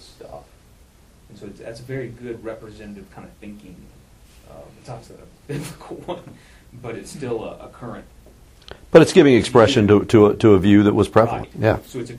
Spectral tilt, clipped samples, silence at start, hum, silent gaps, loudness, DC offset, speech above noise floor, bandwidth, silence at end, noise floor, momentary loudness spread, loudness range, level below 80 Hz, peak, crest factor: -6.5 dB/octave; under 0.1%; 0.3 s; none; none; -15 LUFS; under 0.1%; 32 dB; 14.5 kHz; 0 s; -50 dBFS; 25 LU; 23 LU; -46 dBFS; 0 dBFS; 20 dB